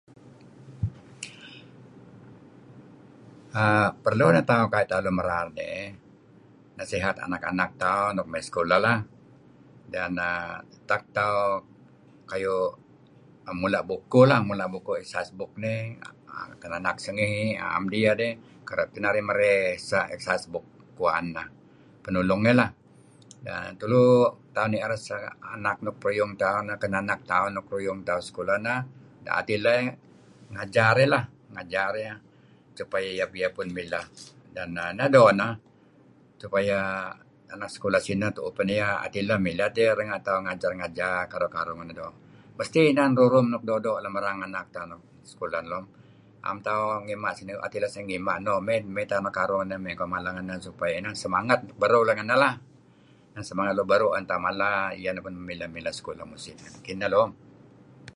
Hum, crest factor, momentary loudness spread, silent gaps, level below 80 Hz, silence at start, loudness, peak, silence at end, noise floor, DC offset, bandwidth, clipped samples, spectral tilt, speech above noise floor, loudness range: none; 24 dB; 17 LU; none; -58 dBFS; 0.25 s; -26 LUFS; -4 dBFS; 0.1 s; -56 dBFS; under 0.1%; 11.5 kHz; under 0.1%; -6 dB/octave; 31 dB; 6 LU